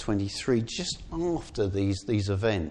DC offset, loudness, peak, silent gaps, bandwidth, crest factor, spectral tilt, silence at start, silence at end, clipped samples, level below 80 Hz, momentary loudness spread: under 0.1%; -29 LUFS; -14 dBFS; none; 10 kHz; 14 dB; -5.5 dB/octave; 0 s; 0 s; under 0.1%; -46 dBFS; 4 LU